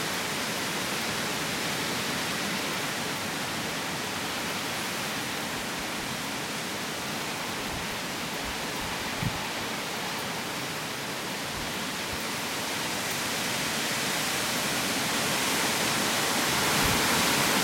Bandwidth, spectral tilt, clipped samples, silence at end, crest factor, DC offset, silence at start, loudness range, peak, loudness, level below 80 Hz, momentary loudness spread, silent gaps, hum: 16.5 kHz; -2 dB/octave; under 0.1%; 0 s; 18 dB; under 0.1%; 0 s; 6 LU; -12 dBFS; -28 LUFS; -54 dBFS; 7 LU; none; none